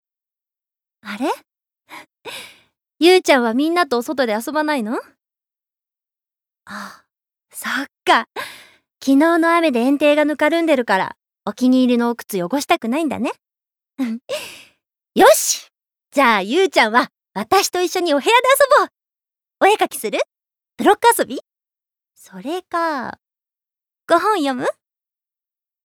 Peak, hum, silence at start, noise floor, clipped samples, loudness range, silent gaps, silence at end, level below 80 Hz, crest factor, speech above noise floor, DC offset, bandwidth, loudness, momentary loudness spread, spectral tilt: -2 dBFS; none; 1.05 s; -88 dBFS; under 0.1%; 8 LU; none; 1.15 s; -66 dBFS; 18 dB; 72 dB; under 0.1%; over 20 kHz; -17 LUFS; 17 LU; -3 dB/octave